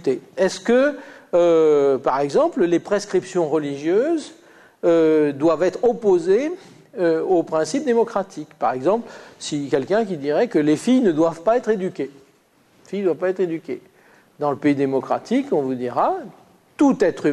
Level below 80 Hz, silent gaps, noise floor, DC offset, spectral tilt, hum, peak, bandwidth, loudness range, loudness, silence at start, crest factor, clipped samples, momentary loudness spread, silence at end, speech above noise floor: -62 dBFS; none; -57 dBFS; under 0.1%; -6 dB/octave; none; -6 dBFS; 11 kHz; 5 LU; -20 LUFS; 0.05 s; 14 dB; under 0.1%; 11 LU; 0 s; 38 dB